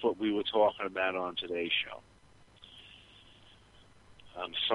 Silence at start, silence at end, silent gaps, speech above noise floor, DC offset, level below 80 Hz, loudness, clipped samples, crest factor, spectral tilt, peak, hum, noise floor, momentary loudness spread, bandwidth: 0 s; 0 s; none; 28 dB; under 0.1%; -68 dBFS; -32 LUFS; under 0.1%; 20 dB; -5 dB/octave; -14 dBFS; none; -59 dBFS; 24 LU; 11.5 kHz